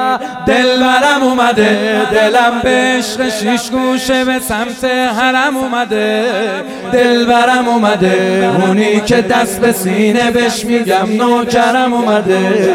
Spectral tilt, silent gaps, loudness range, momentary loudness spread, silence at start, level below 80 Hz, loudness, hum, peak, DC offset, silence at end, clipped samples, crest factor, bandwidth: -4.5 dB/octave; none; 3 LU; 5 LU; 0 s; -42 dBFS; -12 LUFS; none; 0 dBFS; under 0.1%; 0 s; under 0.1%; 12 dB; 16.5 kHz